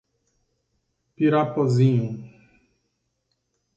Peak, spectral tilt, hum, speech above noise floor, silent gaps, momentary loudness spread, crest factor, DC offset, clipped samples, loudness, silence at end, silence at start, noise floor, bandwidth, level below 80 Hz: -8 dBFS; -8.5 dB/octave; none; 55 dB; none; 11 LU; 18 dB; under 0.1%; under 0.1%; -22 LUFS; 1.5 s; 1.2 s; -75 dBFS; 7.8 kHz; -66 dBFS